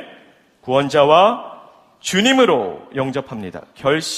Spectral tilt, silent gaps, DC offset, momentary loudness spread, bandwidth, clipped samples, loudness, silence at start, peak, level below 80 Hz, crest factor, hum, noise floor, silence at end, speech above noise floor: -4 dB/octave; none; under 0.1%; 18 LU; 15 kHz; under 0.1%; -16 LUFS; 0 s; 0 dBFS; -58 dBFS; 18 dB; none; -50 dBFS; 0 s; 33 dB